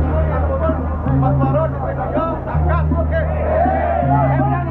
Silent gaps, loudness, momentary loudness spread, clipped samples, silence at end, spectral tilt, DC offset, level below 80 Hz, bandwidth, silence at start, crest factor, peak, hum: none; -18 LUFS; 5 LU; under 0.1%; 0 s; -11.5 dB/octave; under 0.1%; -26 dBFS; 4 kHz; 0 s; 14 dB; -2 dBFS; none